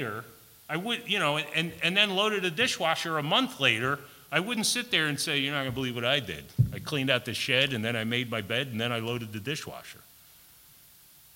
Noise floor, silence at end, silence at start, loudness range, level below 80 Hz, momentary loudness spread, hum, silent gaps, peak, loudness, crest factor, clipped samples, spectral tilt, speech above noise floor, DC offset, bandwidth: -56 dBFS; 1.4 s; 0 s; 4 LU; -58 dBFS; 10 LU; none; none; -6 dBFS; -27 LUFS; 22 dB; under 0.1%; -3.5 dB/octave; 27 dB; under 0.1%; 16.5 kHz